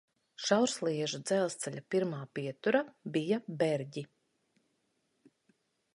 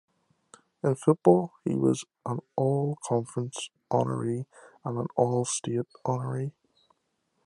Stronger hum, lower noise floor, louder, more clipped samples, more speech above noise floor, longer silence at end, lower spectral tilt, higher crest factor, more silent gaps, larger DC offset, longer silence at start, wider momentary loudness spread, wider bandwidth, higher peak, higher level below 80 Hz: neither; about the same, -78 dBFS vs -76 dBFS; second, -33 LUFS vs -28 LUFS; neither; about the same, 45 dB vs 48 dB; first, 1.9 s vs 0.95 s; second, -4.5 dB/octave vs -6.5 dB/octave; about the same, 22 dB vs 24 dB; neither; neither; second, 0.4 s vs 0.85 s; about the same, 11 LU vs 13 LU; about the same, 11.5 kHz vs 11.5 kHz; second, -12 dBFS vs -6 dBFS; second, -82 dBFS vs -74 dBFS